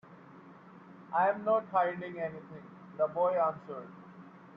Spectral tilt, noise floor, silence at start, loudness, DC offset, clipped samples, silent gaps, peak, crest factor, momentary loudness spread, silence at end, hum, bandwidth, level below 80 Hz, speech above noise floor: -8.5 dB/octave; -54 dBFS; 0.05 s; -32 LUFS; under 0.1%; under 0.1%; none; -16 dBFS; 18 dB; 25 LU; 0 s; none; 5.2 kHz; -80 dBFS; 22 dB